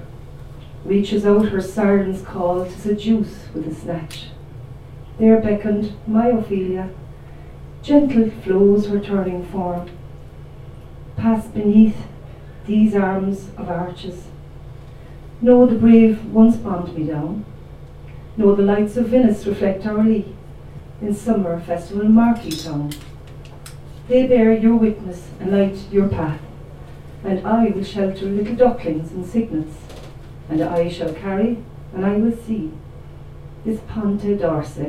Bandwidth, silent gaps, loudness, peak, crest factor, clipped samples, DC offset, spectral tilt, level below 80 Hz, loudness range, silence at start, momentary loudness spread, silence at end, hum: 11 kHz; none; -18 LUFS; 0 dBFS; 18 dB; under 0.1%; under 0.1%; -8 dB/octave; -42 dBFS; 6 LU; 0 s; 24 LU; 0 s; none